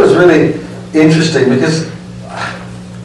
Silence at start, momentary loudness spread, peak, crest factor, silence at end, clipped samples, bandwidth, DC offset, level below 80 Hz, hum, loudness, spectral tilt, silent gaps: 0 s; 19 LU; 0 dBFS; 12 dB; 0 s; under 0.1%; 11 kHz; under 0.1%; -44 dBFS; none; -11 LUFS; -6 dB/octave; none